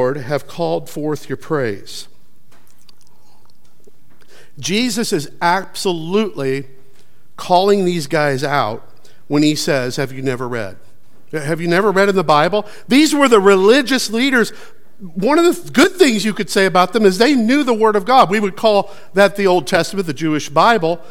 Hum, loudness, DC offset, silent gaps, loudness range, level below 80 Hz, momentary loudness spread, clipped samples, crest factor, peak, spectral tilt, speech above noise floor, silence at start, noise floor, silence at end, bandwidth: none; -15 LUFS; 3%; none; 11 LU; -62 dBFS; 11 LU; under 0.1%; 16 dB; 0 dBFS; -4.5 dB/octave; 40 dB; 0 s; -55 dBFS; 0.1 s; 16.5 kHz